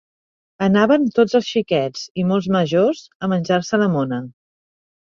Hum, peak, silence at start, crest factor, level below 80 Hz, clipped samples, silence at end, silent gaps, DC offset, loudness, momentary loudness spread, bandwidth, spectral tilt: none; -2 dBFS; 0.6 s; 18 dB; -58 dBFS; under 0.1%; 0.75 s; 2.11-2.15 s, 3.15-3.20 s; under 0.1%; -19 LUFS; 9 LU; 7.4 kHz; -6.5 dB/octave